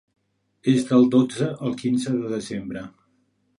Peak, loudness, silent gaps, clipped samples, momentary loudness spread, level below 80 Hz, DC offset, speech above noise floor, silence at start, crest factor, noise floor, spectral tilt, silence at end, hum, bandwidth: -4 dBFS; -22 LUFS; none; under 0.1%; 16 LU; -62 dBFS; under 0.1%; 45 dB; 0.65 s; 18 dB; -67 dBFS; -6.5 dB/octave; 0.7 s; none; 11 kHz